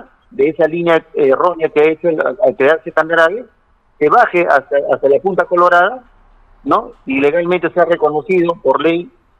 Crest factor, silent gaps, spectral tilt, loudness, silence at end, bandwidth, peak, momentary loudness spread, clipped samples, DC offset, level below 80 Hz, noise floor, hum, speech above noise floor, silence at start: 14 dB; none; -7 dB/octave; -13 LUFS; 0.3 s; 8.6 kHz; 0 dBFS; 6 LU; under 0.1%; under 0.1%; -52 dBFS; -46 dBFS; none; 34 dB; 0.4 s